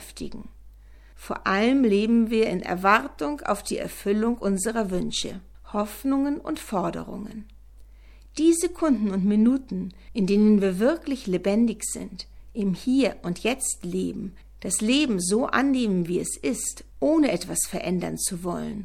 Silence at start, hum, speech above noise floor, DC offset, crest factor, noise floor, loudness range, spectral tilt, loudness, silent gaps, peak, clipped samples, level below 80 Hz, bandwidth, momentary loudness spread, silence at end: 0 s; none; 24 dB; under 0.1%; 22 dB; -48 dBFS; 4 LU; -4.5 dB/octave; -24 LUFS; none; -4 dBFS; under 0.1%; -48 dBFS; 16.5 kHz; 14 LU; 0 s